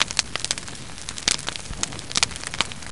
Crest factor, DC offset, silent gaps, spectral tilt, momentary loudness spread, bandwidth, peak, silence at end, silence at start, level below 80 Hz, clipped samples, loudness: 26 dB; 1%; none; -0.5 dB/octave; 10 LU; 11.5 kHz; -2 dBFS; 0 s; 0 s; -44 dBFS; under 0.1%; -25 LUFS